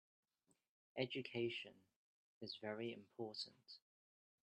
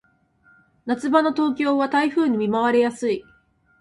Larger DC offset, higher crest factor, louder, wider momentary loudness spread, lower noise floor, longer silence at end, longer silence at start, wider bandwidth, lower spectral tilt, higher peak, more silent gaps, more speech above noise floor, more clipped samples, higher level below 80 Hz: neither; first, 24 dB vs 18 dB; second, -49 LUFS vs -21 LUFS; first, 15 LU vs 8 LU; first, -84 dBFS vs -59 dBFS; about the same, 0.65 s vs 0.6 s; about the same, 0.95 s vs 0.85 s; second, 9.4 kHz vs 11.5 kHz; about the same, -5.5 dB/octave vs -5.5 dB/octave; second, -28 dBFS vs -4 dBFS; first, 1.96-2.41 s vs none; about the same, 36 dB vs 39 dB; neither; second, under -90 dBFS vs -64 dBFS